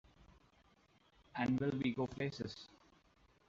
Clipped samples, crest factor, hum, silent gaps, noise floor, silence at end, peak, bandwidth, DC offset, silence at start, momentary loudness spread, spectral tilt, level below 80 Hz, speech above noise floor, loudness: under 0.1%; 18 dB; none; none; -71 dBFS; 0.8 s; -24 dBFS; 7.6 kHz; under 0.1%; 1.35 s; 15 LU; -5.5 dB/octave; -68 dBFS; 33 dB; -40 LUFS